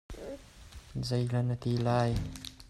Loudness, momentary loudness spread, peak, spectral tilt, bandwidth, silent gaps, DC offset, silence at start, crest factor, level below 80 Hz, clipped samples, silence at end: -32 LUFS; 19 LU; -16 dBFS; -7 dB/octave; 13 kHz; none; under 0.1%; 0.1 s; 16 dB; -48 dBFS; under 0.1%; 0 s